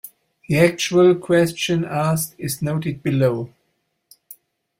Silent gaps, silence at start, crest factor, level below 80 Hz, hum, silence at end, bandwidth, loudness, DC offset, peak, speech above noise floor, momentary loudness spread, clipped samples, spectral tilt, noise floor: none; 0.05 s; 18 dB; -56 dBFS; none; 0.45 s; 16.5 kHz; -19 LUFS; under 0.1%; -2 dBFS; 52 dB; 10 LU; under 0.1%; -5.5 dB/octave; -71 dBFS